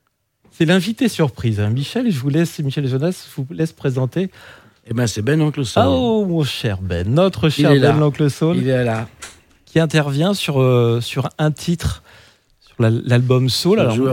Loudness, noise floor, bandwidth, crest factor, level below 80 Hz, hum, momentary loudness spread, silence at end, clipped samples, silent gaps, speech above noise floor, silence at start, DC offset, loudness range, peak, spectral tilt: -17 LUFS; -59 dBFS; 17 kHz; 16 dB; -44 dBFS; none; 8 LU; 0 s; under 0.1%; none; 42 dB; 0.6 s; under 0.1%; 5 LU; 0 dBFS; -6.5 dB/octave